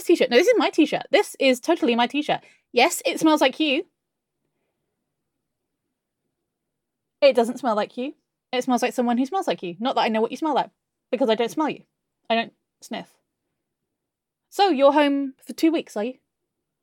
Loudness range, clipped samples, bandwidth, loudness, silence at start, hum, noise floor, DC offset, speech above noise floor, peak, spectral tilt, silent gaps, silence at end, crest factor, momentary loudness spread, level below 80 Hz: 7 LU; under 0.1%; 17.5 kHz; -22 LUFS; 0 s; none; -83 dBFS; under 0.1%; 62 dB; -4 dBFS; -3.5 dB/octave; none; 0.7 s; 20 dB; 14 LU; -82 dBFS